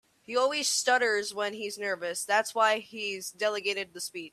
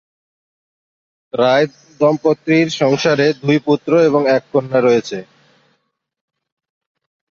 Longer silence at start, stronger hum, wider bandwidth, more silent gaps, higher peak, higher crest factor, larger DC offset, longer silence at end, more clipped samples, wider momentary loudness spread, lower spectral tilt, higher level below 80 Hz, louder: second, 0.3 s vs 1.35 s; neither; first, 15 kHz vs 7.4 kHz; neither; second, -10 dBFS vs -2 dBFS; about the same, 18 dB vs 16 dB; neither; second, 0.05 s vs 2.15 s; neither; first, 9 LU vs 5 LU; second, -0.5 dB/octave vs -6 dB/octave; second, -82 dBFS vs -62 dBFS; second, -29 LUFS vs -15 LUFS